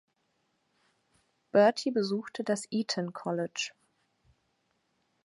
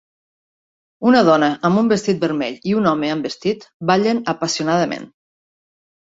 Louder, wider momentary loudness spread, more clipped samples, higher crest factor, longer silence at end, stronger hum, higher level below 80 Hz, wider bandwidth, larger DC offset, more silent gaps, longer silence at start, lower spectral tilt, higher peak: second, -30 LUFS vs -18 LUFS; about the same, 10 LU vs 9 LU; neither; first, 24 dB vs 18 dB; first, 1.55 s vs 1.05 s; neither; second, -80 dBFS vs -60 dBFS; first, 11.5 kHz vs 8 kHz; neither; second, none vs 3.74-3.80 s; first, 1.55 s vs 1 s; about the same, -4.5 dB/octave vs -5.5 dB/octave; second, -10 dBFS vs -2 dBFS